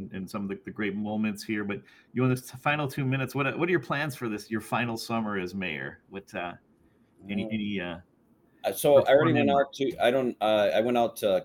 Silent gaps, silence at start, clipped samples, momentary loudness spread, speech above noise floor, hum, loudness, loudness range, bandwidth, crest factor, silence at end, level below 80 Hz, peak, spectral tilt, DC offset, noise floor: none; 0 s; under 0.1%; 14 LU; 36 dB; none; -28 LUFS; 9 LU; 18 kHz; 20 dB; 0 s; -66 dBFS; -8 dBFS; -6 dB/octave; under 0.1%; -63 dBFS